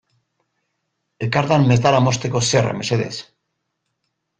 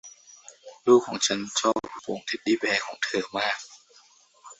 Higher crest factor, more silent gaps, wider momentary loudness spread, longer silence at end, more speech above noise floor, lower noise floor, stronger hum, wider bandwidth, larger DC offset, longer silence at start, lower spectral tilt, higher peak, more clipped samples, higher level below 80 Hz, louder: about the same, 18 dB vs 20 dB; neither; second, 12 LU vs 20 LU; first, 1.15 s vs 0.05 s; first, 58 dB vs 33 dB; first, -75 dBFS vs -58 dBFS; neither; first, 9.4 kHz vs 8.2 kHz; neither; first, 1.2 s vs 0.05 s; first, -5 dB/octave vs -2.5 dB/octave; first, -2 dBFS vs -6 dBFS; neither; first, -52 dBFS vs -70 dBFS; first, -18 LUFS vs -25 LUFS